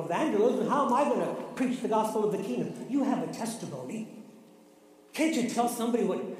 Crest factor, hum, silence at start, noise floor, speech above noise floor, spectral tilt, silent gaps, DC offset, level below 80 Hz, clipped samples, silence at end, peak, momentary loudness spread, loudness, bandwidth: 16 dB; none; 0 s; -57 dBFS; 28 dB; -5 dB/octave; none; under 0.1%; -78 dBFS; under 0.1%; 0 s; -14 dBFS; 12 LU; -29 LUFS; 15.5 kHz